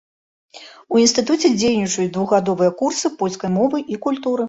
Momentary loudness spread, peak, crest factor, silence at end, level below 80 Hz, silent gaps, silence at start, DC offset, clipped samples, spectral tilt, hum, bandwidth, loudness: 7 LU; -4 dBFS; 16 dB; 0 s; -58 dBFS; none; 0.55 s; under 0.1%; under 0.1%; -4.5 dB/octave; none; 8.2 kHz; -18 LUFS